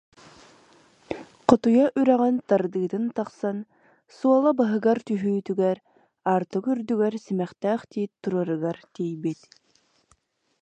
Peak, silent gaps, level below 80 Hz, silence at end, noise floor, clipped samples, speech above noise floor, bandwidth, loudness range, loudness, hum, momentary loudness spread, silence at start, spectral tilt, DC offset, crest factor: 0 dBFS; none; -66 dBFS; 1.25 s; -66 dBFS; under 0.1%; 42 dB; 8.6 kHz; 5 LU; -24 LUFS; none; 12 LU; 1.1 s; -8 dB/octave; under 0.1%; 24 dB